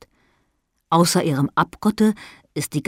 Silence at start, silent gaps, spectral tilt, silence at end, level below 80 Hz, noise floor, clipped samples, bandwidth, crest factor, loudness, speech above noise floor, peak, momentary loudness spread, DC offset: 0.9 s; none; -5 dB/octave; 0.05 s; -56 dBFS; -70 dBFS; under 0.1%; 16 kHz; 16 dB; -20 LUFS; 50 dB; -4 dBFS; 13 LU; under 0.1%